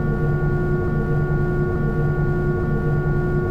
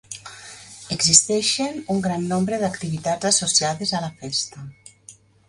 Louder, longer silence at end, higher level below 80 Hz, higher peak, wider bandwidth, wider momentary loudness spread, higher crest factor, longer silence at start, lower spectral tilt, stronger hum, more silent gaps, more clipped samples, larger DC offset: about the same, -21 LUFS vs -20 LUFS; second, 0 s vs 0.35 s; first, -28 dBFS vs -56 dBFS; second, -10 dBFS vs 0 dBFS; second, 4.9 kHz vs 11.5 kHz; second, 1 LU vs 24 LU; second, 10 dB vs 24 dB; about the same, 0 s vs 0.1 s; first, -10.5 dB/octave vs -2.5 dB/octave; neither; neither; neither; neither